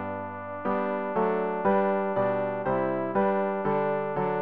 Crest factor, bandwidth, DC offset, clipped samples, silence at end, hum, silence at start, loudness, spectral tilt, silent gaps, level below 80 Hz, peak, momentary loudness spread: 12 dB; 4.7 kHz; 0.3%; under 0.1%; 0 s; none; 0 s; -27 LUFS; -6.5 dB/octave; none; -62 dBFS; -14 dBFS; 5 LU